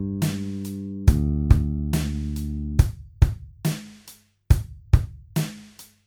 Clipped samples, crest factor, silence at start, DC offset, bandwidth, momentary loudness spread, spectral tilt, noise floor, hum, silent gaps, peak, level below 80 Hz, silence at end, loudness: under 0.1%; 20 dB; 0 s; under 0.1%; 19 kHz; 11 LU; -6.5 dB/octave; -51 dBFS; none; none; -2 dBFS; -28 dBFS; 0.2 s; -25 LUFS